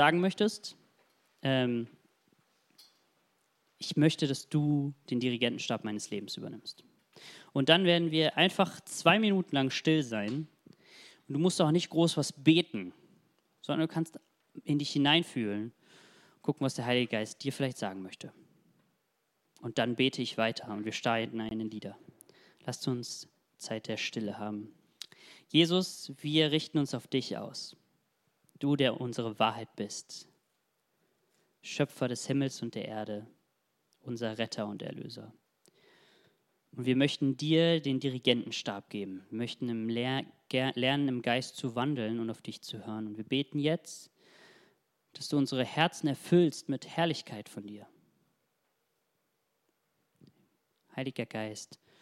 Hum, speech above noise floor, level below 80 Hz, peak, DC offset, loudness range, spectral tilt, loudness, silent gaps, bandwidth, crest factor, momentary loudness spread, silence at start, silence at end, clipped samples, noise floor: none; 48 dB; -78 dBFS; -6 dBFS; under 0.1%; 9 LU; -5 dB/octave; -31 LUFS; none; 14.5 kHz; 26 dB; 18 LU; 0 s; 0.25 s; under 0.1%; -79 dBFS